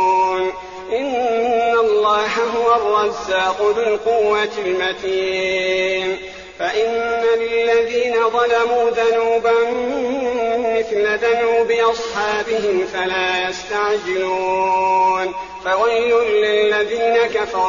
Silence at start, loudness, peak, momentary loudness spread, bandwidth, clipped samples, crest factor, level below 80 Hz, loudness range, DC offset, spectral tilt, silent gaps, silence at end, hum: 0 s; -17 LUFS; -4 dBFS; 5 LU; 7.4 kHz; under 0.1%; 12 dB; -52 dBFS; 2 LU; 0.2%; -0.5 dB/octave; none; 0 s; none